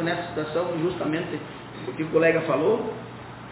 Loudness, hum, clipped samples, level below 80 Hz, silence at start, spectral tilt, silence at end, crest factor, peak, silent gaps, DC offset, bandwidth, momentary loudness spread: -25 LUFS; none; under 0.1%; -56 dBFS; 0 s; -10.5 dB/octave; 0 s; 18 dB; -8 dBFS; none; under 0.1%; 4 kHz; 16 LU